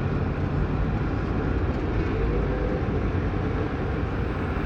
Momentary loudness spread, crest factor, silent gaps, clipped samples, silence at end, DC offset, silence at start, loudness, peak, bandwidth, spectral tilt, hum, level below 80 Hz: 2 LU; 12 dB; none; under 0.1%; 0 s; under 0.1%; 0 s; -27 LUFS; -12 dBFS; 6.6 kHz; -9 dB/octave; none; -30 dBFS